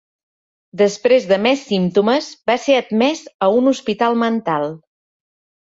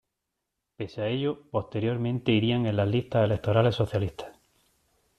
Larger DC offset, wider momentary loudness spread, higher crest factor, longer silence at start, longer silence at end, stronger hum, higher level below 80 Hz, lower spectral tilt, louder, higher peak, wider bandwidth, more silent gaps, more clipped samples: neither; second, 6 LU vs 12 LU; about the same, 16 dB vs 18 dB; about the same, 0.75 s vs 0.8 s; about the same, 0.85 s vs 0.9 s; neither; second, -62 dBFS vs -56 dBFS; second, -5 dB/octave vs -8 dB/octave; first, -17 LUFS vs -27 LUFS; first, -2 dBFS vs -10 dBFS; about the same, 8 kHz vs 8.8 kHz; first, 3.34-3.39 s vs none; neither